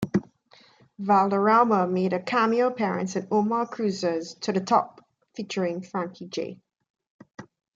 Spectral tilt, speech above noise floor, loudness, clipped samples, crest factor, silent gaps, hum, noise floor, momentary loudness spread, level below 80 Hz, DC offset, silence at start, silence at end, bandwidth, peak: -6 dB/octave; 33 dB; -25 LUFS; under 0.1%; 18 dB; 6.90-6.94 s, 7.10-7.19 s, 7.34-7.38 s; none; -57 dBFS; 13 LU; -68 dBFS; under 0.1%; 0 s; 0.35 s; 7.8 kHz; -8 dBFS